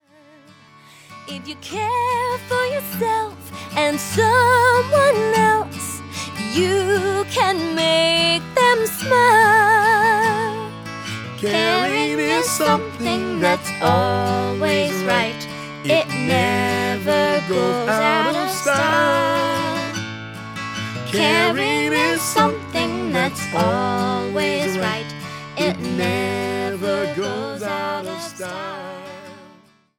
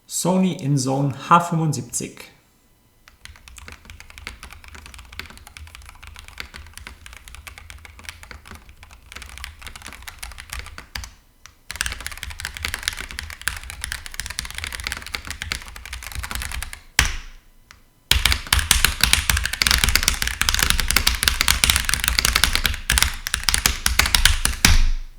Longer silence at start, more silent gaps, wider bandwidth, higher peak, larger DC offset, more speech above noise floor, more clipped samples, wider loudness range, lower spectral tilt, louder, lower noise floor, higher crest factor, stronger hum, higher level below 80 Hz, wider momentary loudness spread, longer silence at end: first, 1.1 s vs 0.1 s; neither; about the same, 19.5 kHz vs over 20 kHz; about the same, -2 dBFS vs 0 dBFS; neither; second, 33 dB vs 37 dB; neither; second, 7 LU vs 21 LU; first, -4 dB/octave vs -2 dB/octave; about the same, -18 LUFS vs -20 LUFS; second, -51 dBFS vs -57 dBFS; second, 16 dB vs 24 dB; neither; second, -58 dBFS vs -30 dBFS; second, 14 LU vs 24 LU; first, 0.5 s vs 0 s